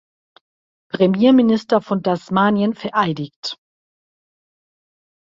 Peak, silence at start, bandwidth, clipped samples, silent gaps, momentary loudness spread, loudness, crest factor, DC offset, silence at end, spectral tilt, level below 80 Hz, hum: -2 dBFS; 0.95 s; 7.6 kHz; under 0.1%; 3.36-3.43 s; 16 LU; -17 LUFS; 18 dB; under 0.1%; 1.65 s; -7 dB/octave; -60 dBFS; none